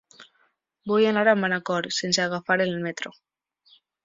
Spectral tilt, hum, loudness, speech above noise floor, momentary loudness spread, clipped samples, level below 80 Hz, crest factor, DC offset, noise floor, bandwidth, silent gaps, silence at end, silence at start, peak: -4 dB/octave; none; -23 LUFS; 44 dB; 14 LU; under 0.1%; -70 dBFS; 20 dB; under 0.1%; -68 dBFS; 7.8 kHz; none; 0.95 s; 0.2 s; -4 dBFS